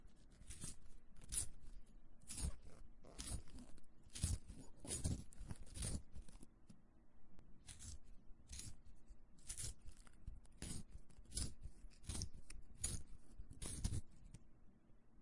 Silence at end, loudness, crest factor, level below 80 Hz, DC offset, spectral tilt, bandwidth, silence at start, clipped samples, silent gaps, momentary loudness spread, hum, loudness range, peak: 0 s; -50 LUFS; 24 dB; -56 dBFS; under 0.1%; -3.5 dB/octave; 11.5 kHz; 0 s; under 0.1%; none; 21 LU; none; 6 LU; -26 dBFS